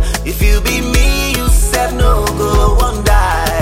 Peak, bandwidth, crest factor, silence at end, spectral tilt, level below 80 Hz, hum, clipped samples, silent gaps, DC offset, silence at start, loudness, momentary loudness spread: 0 dBFS; 16.5 kHz; 12 dB; 0 s; -4.5 dB/octave; -14 dBFS; none; under 0.1%; none; under 0.1%; 0 s; -13 LUFS; 2 LU